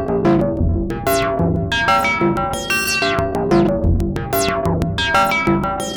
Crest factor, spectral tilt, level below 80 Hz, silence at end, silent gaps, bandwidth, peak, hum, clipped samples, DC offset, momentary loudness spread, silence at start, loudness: 12 dB; -5 dB/octave; -28 dBFS; 0 s; none; over 20 kHz; -4 dBFS; none; under 0.1%; under 0.1%; 5 LU; 0 s; -17 LUFS